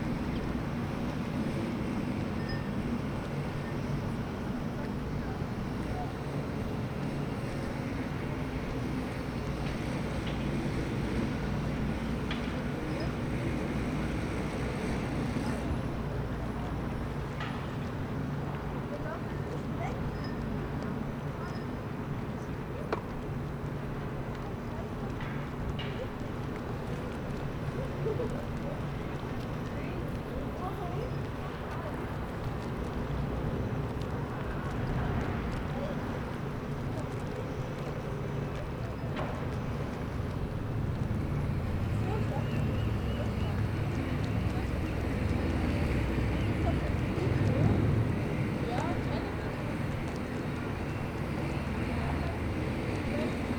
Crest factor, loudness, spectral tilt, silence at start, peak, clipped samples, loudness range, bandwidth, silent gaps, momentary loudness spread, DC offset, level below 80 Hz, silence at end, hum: 20 dB; -34 LUFS; -7.5 dB/octave; 0 s; -14 dBFS; under 0.1%; 6 LU; over 20 kHz; none; 5 LU; under 0.1%; -42 dBFS; 0 s; none